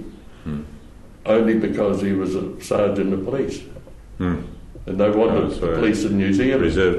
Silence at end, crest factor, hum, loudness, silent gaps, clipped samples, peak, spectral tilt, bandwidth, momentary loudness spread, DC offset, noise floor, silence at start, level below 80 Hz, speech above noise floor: 0 s; 14 dB; none; -21 LUFS; none; under 0.1%; -6 dBFS; -7 dB/octave; 12 kHz; 17 LU; under 0.1%; -41 dBFS; 0 s; -38 dBFS; 22 dB